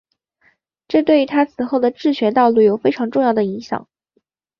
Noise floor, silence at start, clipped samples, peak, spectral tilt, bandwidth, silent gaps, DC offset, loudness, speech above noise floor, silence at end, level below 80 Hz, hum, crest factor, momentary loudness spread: -67 dBFS; 0.9 s; under 0.1%; -2 dBFS; -7 dB/octave; 6.8 kHz; none; under 0.1%; -17 LUFS; 51 dB; 0.8 s; -62 dBFS; none; 16 dB; 8 LU